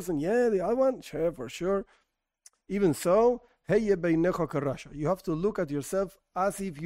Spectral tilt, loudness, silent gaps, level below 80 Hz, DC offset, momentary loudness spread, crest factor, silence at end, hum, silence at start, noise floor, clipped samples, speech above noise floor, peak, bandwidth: -6.5 dB/octave; -28 LUFS; none; -54 dBFS; under 0.1%; 8 LU; 16 dB; 0 s; none; 0 s; -62 dBFS; under 0.1%; 34 dB; -12 dBFS; 16 kHz